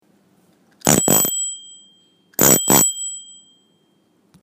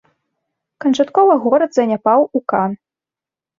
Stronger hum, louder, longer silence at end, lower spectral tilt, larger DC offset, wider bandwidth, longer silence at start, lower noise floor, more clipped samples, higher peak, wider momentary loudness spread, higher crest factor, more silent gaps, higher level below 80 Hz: neither; about the same, -15 LUFS vs -15 LUFS; first, 1.2 s vs 0.85 s; second, -2.5 dB/octave vs -6 dB/octave; neither; first, 16 kHz vs 7.6 kHz; about the same, 0.85 s vs 0.8 s; second, -61 dBFS vs -89 dBFS; neither; about the same, 0 dBFS vs -2 dBFS; first, 16 LU vs 9 LU; first, 20 dB vs 14 dB; neither; first, -52 dBFS vs -66 dBFS